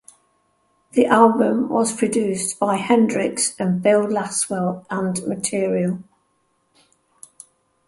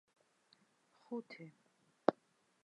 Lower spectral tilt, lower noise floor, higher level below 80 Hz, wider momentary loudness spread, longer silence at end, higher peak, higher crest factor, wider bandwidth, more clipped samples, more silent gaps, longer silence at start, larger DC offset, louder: second, -4.5 dB/octave vs -7 dB/octave; second, -67 dBFS vs -75 dBFS; first, -64 dBFS vs under -90 dBFS; second, 9 LU vs 18 LU; first, 1.85 s vs 0.55 s; first, -2 dBFS vs -10 dBFS; second, 20 dB vs 34 dB; about the same, 12 kHz vs 11 kHz; neither; neither; second, 0.95 s vs 1.1 s; neither; first, -19 LUFS vs -41 LUFS